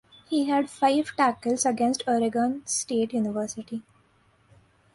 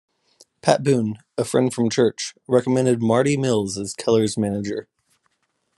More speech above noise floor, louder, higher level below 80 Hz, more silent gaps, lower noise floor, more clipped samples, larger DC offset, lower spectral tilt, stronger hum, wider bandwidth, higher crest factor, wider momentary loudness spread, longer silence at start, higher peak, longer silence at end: second, 38 dB vs 51 dB; second, -26 LUFS vs -21 LUFS; second, -68 dBFS vs -62 dBFS; neither; second, -63 dBFS vs -71 dBFS; neither; neither; second, -3.5 dB/octave vs -5.5 dB/octave; neither; about the same, 11.5 kHz vs 12.5 kHz; about the same, 16 dB vs 20 dB; about the same, 9 LU vs 9 LU; second, 0.3 s vs 0.65 s; second, -10 dBFS vs -2 dBFS; first, 1.15 s vs 0.95 s